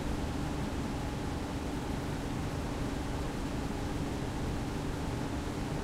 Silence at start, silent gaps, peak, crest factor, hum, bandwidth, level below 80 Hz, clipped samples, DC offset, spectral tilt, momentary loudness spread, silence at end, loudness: 0 s; none; -22 dBFS; 12 dB; none; 16 kHz; -42 dBFS; under 0.1%; under 0.1%; -6 dB/octave; 1 LU; 0 s; -36 LUFS